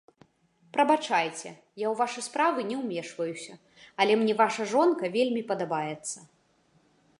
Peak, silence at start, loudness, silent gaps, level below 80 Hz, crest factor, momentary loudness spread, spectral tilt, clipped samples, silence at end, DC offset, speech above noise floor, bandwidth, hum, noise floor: -8 dBFS; 0.75 s; -27 LUFS; none; -80 dBFS; 20 dB; 15 LU; -4 dB/octave; under 0.1%; 0.95 s; under 0.1%; 39 dB; 11.5 kHz; none; -66 dBFS